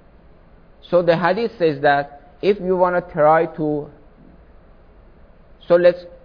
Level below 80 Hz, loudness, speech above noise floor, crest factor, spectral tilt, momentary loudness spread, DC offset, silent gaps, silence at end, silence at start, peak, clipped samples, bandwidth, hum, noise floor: -48 dBFS; -18 LUFS; 30 dB; 18 dB; -8.5 dB/octave; 9 LU; under 0.1%; none; 0.1 s; 0.9 s; -2 dBFS; under 0.1%; 5.2 kHz; none; -47 dBFS